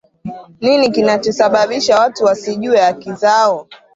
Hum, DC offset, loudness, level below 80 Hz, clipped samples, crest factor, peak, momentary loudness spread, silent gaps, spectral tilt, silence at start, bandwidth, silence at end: none; under 0.1%; -14 LUFS; -56 dBFS; under 0.1%; 14 dB; 0 dBFS; 9 LU; none; -4 dB/octave; 0.25 s; 7.8 kHz; 0.2 s